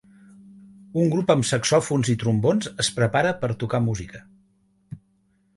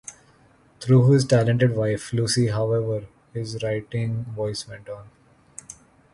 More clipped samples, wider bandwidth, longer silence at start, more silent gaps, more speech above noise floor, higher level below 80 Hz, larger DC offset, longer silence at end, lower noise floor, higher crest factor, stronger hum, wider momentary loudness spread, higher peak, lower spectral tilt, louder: neither; about the same, 11.5 kHz vs 11.5 kHz; first, 0.95 s vs 0.1 s; neither; first, 43 dB vs 35 dB; about the same, -54 dBFS vs -54 dBFS; neither; first, 0.6 s vs 0.4 s; first, -65 dBFS vs -56 dBFS; about the same, 20 dB vs 18 dB; neither; second, 20 LU vs 23 LU; about the same, -4 dBFS vs -6 dBFS; about the same, -5 dB/octave vs -6 dB/octave; about the same, -22 LUFS vs -22 LUFS